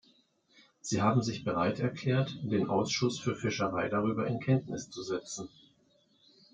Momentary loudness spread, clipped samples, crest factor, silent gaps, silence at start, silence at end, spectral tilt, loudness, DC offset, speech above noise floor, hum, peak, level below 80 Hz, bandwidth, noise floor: 11 LU; under 0.1%; 18 dB; none; 0.85 s; 1.05 s; -5.5 dB/octave; -32 LUFS; under 0.1%; 37 dB; none; -14 dBFS; -68 dBFS; 9.2 kHz; -69 dBFS